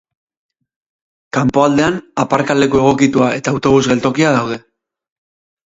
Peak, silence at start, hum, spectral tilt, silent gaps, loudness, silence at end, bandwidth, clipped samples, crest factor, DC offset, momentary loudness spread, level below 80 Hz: 0 dBFS; 1.35 s; none; -5.5 dB/octave; none; -14 LUFS; 1.1 s; 8 kHz; under 0.1%; 16 dB; under 0.1%; 6 LU; -46 dBFS